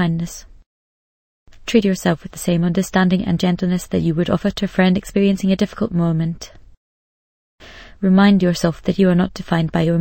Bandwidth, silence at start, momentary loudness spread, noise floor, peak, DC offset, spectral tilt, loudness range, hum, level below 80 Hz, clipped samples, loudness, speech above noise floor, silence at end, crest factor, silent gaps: 16.5 kHz; 0 s; 8 LU; under -90 dBFS; -2 dBFS; under 0.1%; -6.5 dB/octave; 3 LU; none; -42 dBFS; under 0.1%; -18 LUFS; over 73 dB; 0 s; 18 dB; 0.66-1.46 s, 6.77-7.58 s